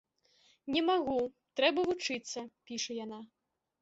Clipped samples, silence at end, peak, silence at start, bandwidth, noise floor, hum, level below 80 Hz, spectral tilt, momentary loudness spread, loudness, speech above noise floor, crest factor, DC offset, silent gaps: under 0.1%; 0.55 s; -14 dBFS; 0.65 s; 8 kHz; -69 dBFS; none; -72 dBFS; -2.5 dB/octave; 14 LU; -33 LUFS; 36 dB; 22 dB; under 0.1%; none